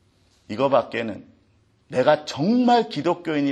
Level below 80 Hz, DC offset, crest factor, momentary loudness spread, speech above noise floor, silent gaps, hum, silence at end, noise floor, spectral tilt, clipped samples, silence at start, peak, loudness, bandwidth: -66 dBFS; under 0.1%; 18 dB; 12 LU; 40 dB; none; none; 0 s; -61 dBFS; -6 dB/octave; under 0.1%; 0.5 s; -4 dBFS; -22 LUFS; 9.4 kHz